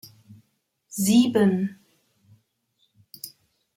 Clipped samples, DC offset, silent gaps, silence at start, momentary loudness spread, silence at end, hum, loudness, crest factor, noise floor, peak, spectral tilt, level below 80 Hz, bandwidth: under 0.1%; under 0.1%; none; 0.95 s; 21 LU; 0.5 s; none; -21 LUFS; 18 dB; -72 dBFS; -8 dBFS; -5.5 dB/octave; -68 dBFS; 16.5 kHz